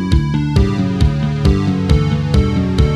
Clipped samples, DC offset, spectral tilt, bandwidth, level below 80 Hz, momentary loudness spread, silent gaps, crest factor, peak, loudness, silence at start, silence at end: under 0.1%; under 0.1%; -7.5 dB/octave; 11.5 kHz; -20 dBFS; 1 LU; none; 14 dB; 0 dBFS; -15 LUFS; 0 s; 0 s